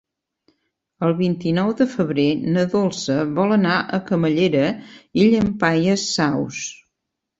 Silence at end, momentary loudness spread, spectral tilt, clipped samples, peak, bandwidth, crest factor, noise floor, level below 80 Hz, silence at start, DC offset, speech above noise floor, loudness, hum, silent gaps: 0.65 s; 7 LU; -5.5 dB/octave; under 0.1%; -2 dBFS; 8 kHz; 18 dB; -80 dBFS; -54 dBFS; 1 s; under 0.1%; 61 dB; -19 LUFS; none; none